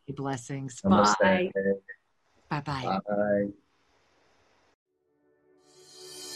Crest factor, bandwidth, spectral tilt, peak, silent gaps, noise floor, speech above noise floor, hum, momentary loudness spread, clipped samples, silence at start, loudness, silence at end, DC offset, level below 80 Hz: 22 dB; 12.5 kHz; -5.5 dB/octave; -8 dBFS; 4.75-4.86 s; -70 dBFS; 44 dB; none; 18 LU; under 0.1%; 0.1 s; -27 LUFS; 0 s; under 0.1%; -62 dBFS